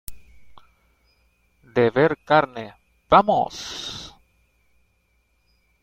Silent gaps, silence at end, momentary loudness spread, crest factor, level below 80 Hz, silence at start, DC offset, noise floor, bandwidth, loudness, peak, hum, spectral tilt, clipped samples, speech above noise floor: none; 1.75 s; 22 LU; 22 dB; -52 dBFS; 0.1 s; under 0.1%; -66 dBFS; 16.5 kHz; -21 LUFS; -2 dBFS; none; -5.5 dB/octave; under 0.1%; 47 dB